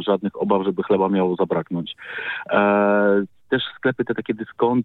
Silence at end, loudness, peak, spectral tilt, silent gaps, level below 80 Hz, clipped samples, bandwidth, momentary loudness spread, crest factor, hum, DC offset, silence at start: 0 s; -21 LUFS; -4 dBFS; -9 dB/octave; none; -62 dBFS; under 0.1%; 4.2 kHz; 11 LU; 16 dB; none; under 0.1%; 0 s